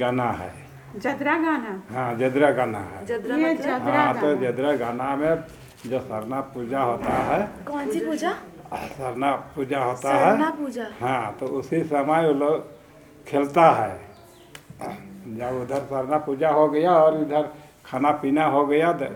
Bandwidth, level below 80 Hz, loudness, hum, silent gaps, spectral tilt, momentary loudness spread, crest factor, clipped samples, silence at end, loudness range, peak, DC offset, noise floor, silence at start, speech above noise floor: 18.5 kHz; -56 dBFS; -23 LUFS; none; none; -6.5 dB/octave; 14 LU; 22 dB; under 0.1%; 0 s; 4 LU; -2 dBFS; under 0.1%; -48 dBFS; 0 s; 25 dB